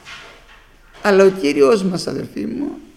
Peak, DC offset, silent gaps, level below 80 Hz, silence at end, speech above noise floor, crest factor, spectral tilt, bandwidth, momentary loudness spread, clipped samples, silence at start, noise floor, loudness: 0 dBFS; under 0.1%; none; -50 dBFS; 0.15 s; 30 dB; 18 dB; -5.5 dB/octave; 13.5 kHz; 13 LU; under 0.1%; 0.05 s; -46 dBFS; -16 LUFS